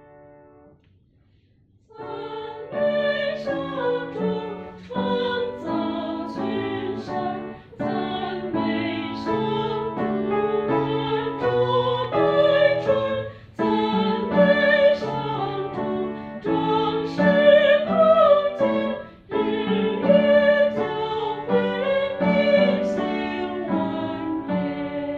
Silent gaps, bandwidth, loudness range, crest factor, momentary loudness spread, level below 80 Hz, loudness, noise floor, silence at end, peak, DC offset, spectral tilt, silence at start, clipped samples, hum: none; 6.8 kHz; 8 LU; 18 dB; 12 LU; -56 dBFS; -22 LUFS; -59 dBFS; 0 s; -4 dBFS; under 0.1%; -7.5 dB/octave; 1.95 s; under 0.1%; none